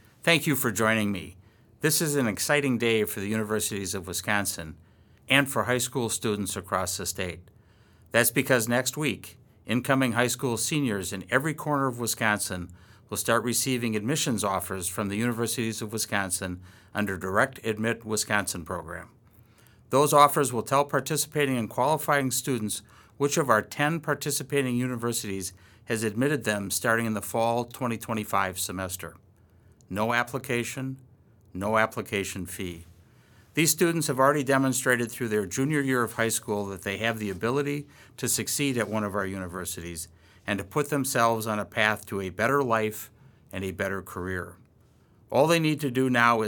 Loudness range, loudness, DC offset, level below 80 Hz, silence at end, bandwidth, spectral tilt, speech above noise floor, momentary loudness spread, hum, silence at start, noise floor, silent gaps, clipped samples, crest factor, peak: 5 LU; -27 LUFS; under 0.1%; -62 dBFS; 0 s; 19 kHz; -4 dB/octave; 33 dB; 12 LU; none; 0.25 s; -59 dBFS; none; under 0.1%; 24 dB; -4 dBFS